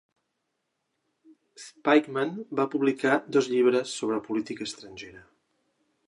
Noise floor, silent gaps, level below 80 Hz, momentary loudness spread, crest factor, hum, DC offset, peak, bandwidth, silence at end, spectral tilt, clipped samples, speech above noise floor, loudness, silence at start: -80 dBFS; none; -74 dBFS; 20 LU; 22 dB; none; under 0.1%; -6 dBFS; 11 kHz; 0.85 s; -4.5 dB/octave; under 0.1%; 53 dB; -26 LUFS; 1.6 s